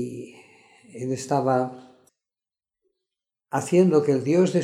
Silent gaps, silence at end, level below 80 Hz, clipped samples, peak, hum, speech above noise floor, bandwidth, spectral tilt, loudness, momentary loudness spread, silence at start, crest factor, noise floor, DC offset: none; 0 s; -74 dBFS; under 0.1%; -8 dBFS; none; over 69 dB; 13.5 kHz; -7 dB/octave; -23 LUFS; 16 LU; 0 s; 18 dB; under -90 dBFS; under 0.1%